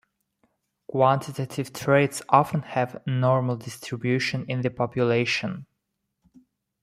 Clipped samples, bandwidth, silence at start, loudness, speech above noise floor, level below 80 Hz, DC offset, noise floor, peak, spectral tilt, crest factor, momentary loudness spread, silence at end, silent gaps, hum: under 0.1%; 15 kHz; 0.9 s; -25 LUFS; 55 dB; -64 dBFS; under 0.1%; -79 dBFS; -4 dBFS; -6 dB/octave; 22 dB; 11 LU; 1.2 s; none; none